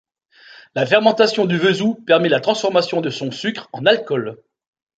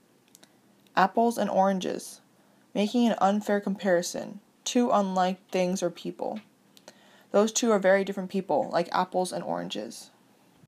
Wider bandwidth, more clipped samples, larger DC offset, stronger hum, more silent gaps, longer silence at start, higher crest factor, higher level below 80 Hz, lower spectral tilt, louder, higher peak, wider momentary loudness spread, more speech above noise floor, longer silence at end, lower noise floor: second, 9 kHz vs 15.5 kHz; neither; neither; neither; neither; second, 0.75 s vs 0.95 s; about the same, 16 dB vs 20 dB; first, -64 dBFS vs -80 dBFS; about the same, -5 dB/octave vs -4.5 dB/octave; first, -17 LUFS vs -27 LUFS; first, -2 dBFS vs -8 dBFS; about the same, 10 LU vs 12 LU; second, 31 dB vs 35 dB; about the same, 0.65 s vs 0.6 s; second, -48 dBFS vs -61 dBFS